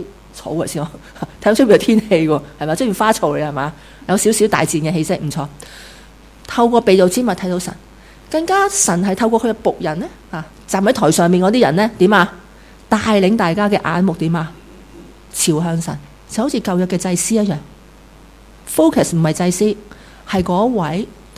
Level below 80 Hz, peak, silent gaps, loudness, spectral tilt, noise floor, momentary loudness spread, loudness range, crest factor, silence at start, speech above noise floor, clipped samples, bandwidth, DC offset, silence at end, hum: -44 dBFS; 0 dBFS; none; -16 LUFS; -5 dB/octave; -42 dBFS; 15 LU; 4 LU; 16 dB; 0 s; 27 dB; under 0.1%; 16 kHz; under 0.1%; 0.25 s; none